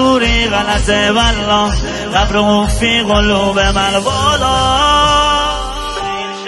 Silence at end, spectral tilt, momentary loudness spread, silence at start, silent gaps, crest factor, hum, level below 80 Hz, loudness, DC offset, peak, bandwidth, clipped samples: 0 s; -4 dB/octave; 8 LU; 0 s; none; 12 dB; none; -22 dBFS; -12 LUFS; under 0.1%; 0 dBFS; 12 kHz; under 0.1%